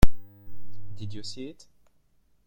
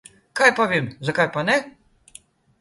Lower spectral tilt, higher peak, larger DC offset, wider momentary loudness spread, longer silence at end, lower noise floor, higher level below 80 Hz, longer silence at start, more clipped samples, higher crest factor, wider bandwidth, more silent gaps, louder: first, -6 dB/octave vs -4.5 dB/octave; about the same, -2 dBFS vs -2 dBFS; neither; first, 17 LU vs 8 LU; about the same, 0.95 s vs 0.9 s; first, -67 dBFS vs -50 dBFS; first, -32 dBFS vs -62 dBFS; second, 0 s vs 0.35 s; neither; about the same, 20 dB vs 22 dB; first, 16.5 kHz vs 11.5 kHz; neither; second, -36 LUFS vs -20 LUFS